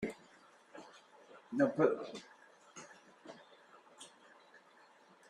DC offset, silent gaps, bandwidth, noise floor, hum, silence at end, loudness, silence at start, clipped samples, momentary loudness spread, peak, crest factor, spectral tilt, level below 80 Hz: under 0.1%; none; 11.5 kHz; -64 dBFS; none; 0.7 s; -35 LUFS; 0 s; under 0.1%; 28 LU; -14 dBFS; 26 dB; -6 dB/octave; -80 dBFS